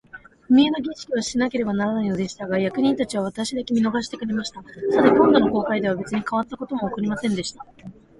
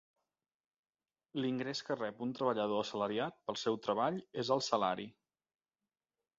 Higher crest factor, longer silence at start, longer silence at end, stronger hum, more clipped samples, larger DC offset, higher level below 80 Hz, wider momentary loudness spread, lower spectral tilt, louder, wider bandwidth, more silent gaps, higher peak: about the same, 20 dB vs 22 dB; second, 0.15 s vs 1.35 s; second, 0.25 s vs 1.3 s; neither; neither; neither; first, -54 dBFS vs -80 dBFS; first, 11 LU vs 6 LU; first, -5.5 dB/octave vs -3.5 dB/octave; first, -22 LUFS vs -37 LUFS; first, 11.5 kHz vs 7.6 kHz; neither; first, -2 dBFS vs -16 dBFS